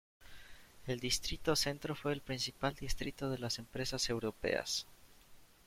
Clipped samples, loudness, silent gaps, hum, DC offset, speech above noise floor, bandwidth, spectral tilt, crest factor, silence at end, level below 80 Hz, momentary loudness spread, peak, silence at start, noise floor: under 0.1%; -38 LUFS; none; none; under 0.1%; 22 dB; 16.5 kHz; -3.5 dB/octave; 20 dB; 0.2 s; -52 dBFS; 12 LU; -18 dBFS; 0.2 s; -59 dBFS